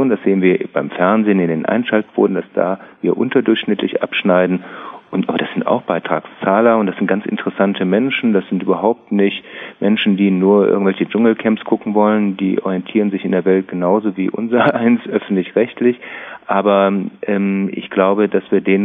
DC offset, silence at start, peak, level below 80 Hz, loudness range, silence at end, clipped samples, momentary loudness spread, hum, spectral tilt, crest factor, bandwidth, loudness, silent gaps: under 0.1%; 0 s; 0 dBFS; -66 dBFS; 2 LU; 0 s; under 0.1%; 7 LU; none; -10 dB/octave; 14 dB; 3.9 kHz; -16 LUFS; none